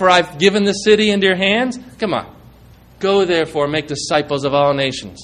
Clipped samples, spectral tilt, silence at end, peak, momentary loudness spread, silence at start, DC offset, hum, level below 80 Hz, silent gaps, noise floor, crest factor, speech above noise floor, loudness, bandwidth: under 0.1%; -4.5 dB/octave; 0 s; 0 dBFS; 8 LU; 0 s; under 0.1%; none; -48 dBFS; none; -44 dBFS; 16 dB; 28 dB; -16 LUFS; 11 kHz